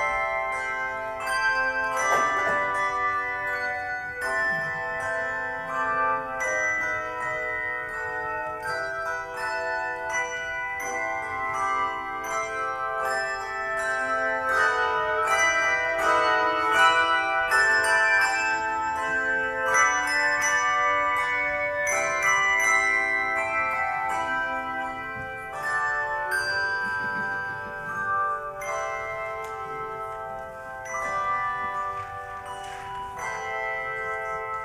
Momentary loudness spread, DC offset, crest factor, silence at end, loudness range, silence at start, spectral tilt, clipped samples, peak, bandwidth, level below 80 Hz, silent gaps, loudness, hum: 11 LU; under 0.1%; 20 dB; 0 s; 9 LU; 0 s; -1.5 dB/octave; under 0.1%; -6 dBFS; over 20 kHz; -56 dBFS; none; -25 LUFS; none